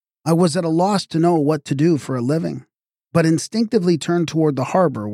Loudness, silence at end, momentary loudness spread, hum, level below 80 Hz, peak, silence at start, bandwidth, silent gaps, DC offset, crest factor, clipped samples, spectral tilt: -19 LUFS; 0 s; 4 LU; none; -62 dBFS; -4 dBFS; 0.25 s; 14 kHz; none; under 0.1%; 14 dB; under 0.1%; -6.5 dB/octave